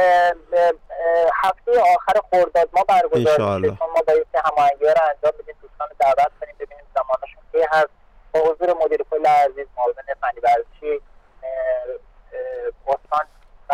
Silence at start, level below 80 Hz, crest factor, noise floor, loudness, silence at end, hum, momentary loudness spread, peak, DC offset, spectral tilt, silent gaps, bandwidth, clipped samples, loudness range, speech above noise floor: 0 s; -50 dBFS; 10 dB; -38 dBFS; -19 LUFS; 0 s; none; 14 LU; -10 dBFS; under 0.1%; -5.5 dB/octave; none; 13.5 kHz; under 0.1%; 7 LU; 21 dB